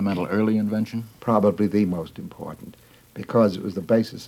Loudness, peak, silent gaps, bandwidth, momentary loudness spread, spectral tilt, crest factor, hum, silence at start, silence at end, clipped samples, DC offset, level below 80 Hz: -23 LUFS; -4 dBFS; none; 15 kHz; 17 LU; -8 dB/octave; 18 dB; none; 0 s; 0 s; under 0.1%; under 0.1%; -60 dBFS